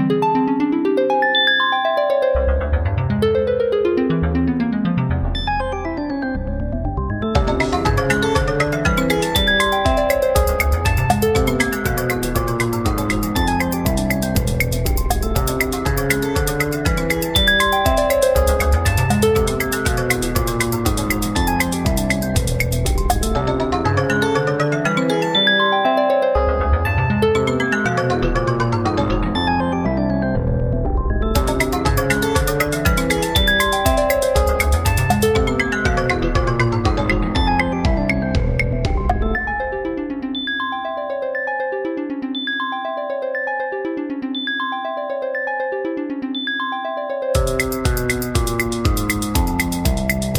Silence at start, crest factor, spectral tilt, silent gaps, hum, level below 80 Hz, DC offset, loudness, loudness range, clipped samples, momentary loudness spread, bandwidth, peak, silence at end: 0 s; 16 dB; -5 dB/octave; none; none; -26 dBFS; under 0.1%; -19 LUFS; 6 LU; under 0.1%; 7 LU; over 20 kHz; -2 dBFS; 0 s